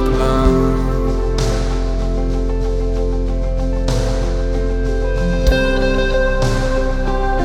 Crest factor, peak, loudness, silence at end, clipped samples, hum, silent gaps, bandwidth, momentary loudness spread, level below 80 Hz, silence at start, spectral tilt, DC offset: 14 dB; 0 dBFS; -18 LUFS; 0 s; under 0.1%; none; none; 9.8 kHz; 5 LU; -18 dBFS; 0 s; -6.5 dB/octave; under 0.1%